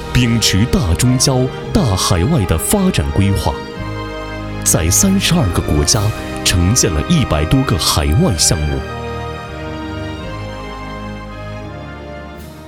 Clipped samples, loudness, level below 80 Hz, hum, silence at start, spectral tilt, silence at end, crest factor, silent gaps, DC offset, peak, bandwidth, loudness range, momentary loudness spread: under 0.1%; -15 LUFS; -26 dBFS; none; 0 s; -4 dB/octave; 0 s; 16 dB; none; under 0.1%; 0 dBFS; 17.5 kHz; 11 LU; 16 LU